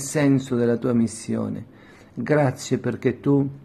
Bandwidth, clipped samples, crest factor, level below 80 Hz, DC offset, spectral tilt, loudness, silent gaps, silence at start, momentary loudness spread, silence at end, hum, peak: 13.5 kHz; under 0.1%; 16 dB; -58 dBFS; under 0.1%; -6.5 dB/octave; -23 LUFS; none; 0 s; 11 LU; 0 s; none; -6 dBFS